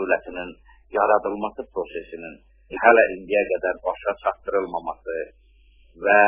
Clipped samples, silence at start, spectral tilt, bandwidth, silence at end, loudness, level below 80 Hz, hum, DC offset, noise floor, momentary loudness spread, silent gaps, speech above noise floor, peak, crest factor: under 0.1%; 0 s; -8 dB/octave; 3.7 kHz; 0 s; -23 LUFS; -54 dBFS; none; under 0.1%; -54 dBFS; 19 LU; none; 32 dB; 0 dBFS; 22 dB